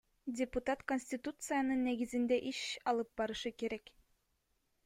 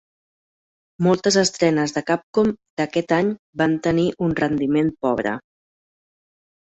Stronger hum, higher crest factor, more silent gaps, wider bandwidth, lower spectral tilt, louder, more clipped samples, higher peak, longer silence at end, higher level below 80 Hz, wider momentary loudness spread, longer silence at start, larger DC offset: neither; about the same, 16 dB vs 18 dB; second, none vs 2.23-2.33 s, 2.70-2.77 s, 3.39-3.53 s; first, 16 kHz vs 8.4 kHz; second, -3.5 dB/octave vs -5 dB/octave; second, -38 LUFS vs -21 LUFS; neither; second, -22 dBFS vs -4 dBFS; second, 1.05 s vs 1.35 s; second, -64 dBFS vs -54 dBFS; about the same, 8 LU vs 6 LU; second, 0.25 s vs 1 s; neither